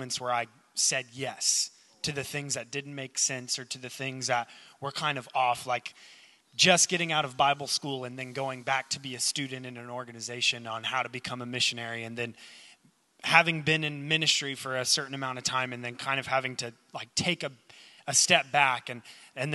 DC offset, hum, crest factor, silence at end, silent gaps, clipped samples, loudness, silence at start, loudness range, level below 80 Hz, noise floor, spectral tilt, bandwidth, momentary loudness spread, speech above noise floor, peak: under 0.1%; none; 28 dB; 0 s; none; under 0.1%; -28 LUFS; 0 s; 5 LU; -72 dBFS; -63 dBFS; -2 dB/octave; 12 kHz; 15 LU; 33 dB; -4 dBFS